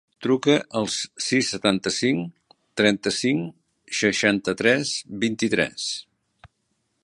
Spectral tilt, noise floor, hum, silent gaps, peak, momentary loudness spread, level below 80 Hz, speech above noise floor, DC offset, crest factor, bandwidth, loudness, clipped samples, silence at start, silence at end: -3.5 dB/octave; -73 dBFS; none; none; -2 dBFS; 9 LU; -60 dBFS; 50 dB; under 0.1%; 22 dB; 11.5 kHz; -23 LUFS; under 0.1%; 0.2 s; 0.55 s